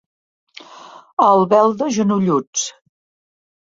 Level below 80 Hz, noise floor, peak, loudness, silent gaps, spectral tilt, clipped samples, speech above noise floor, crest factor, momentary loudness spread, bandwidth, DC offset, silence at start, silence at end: -64 dBFS; -41 dBFS; 0 dBFS; -16 LUFS; 1.13-1.17 s, 2.47-2.53 s; -5 dB/octave; under 0.1%; 26 dB; 18 dB; 11 LU; 7.8 kHz; under 0.1%; 0.75 s; 1 s